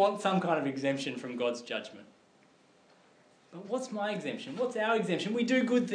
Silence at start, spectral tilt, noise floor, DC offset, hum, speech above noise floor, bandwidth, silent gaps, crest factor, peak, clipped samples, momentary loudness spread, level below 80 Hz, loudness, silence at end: 0 s; -5.5 dB/octave; -64 dBFS; under 0.1%; none; 32 dB; 10.5 kHz; none; 18 dB; -14 dBFS; under 0.1%; 11 LU; under -90 dBFS; -32 LUFS; 0 s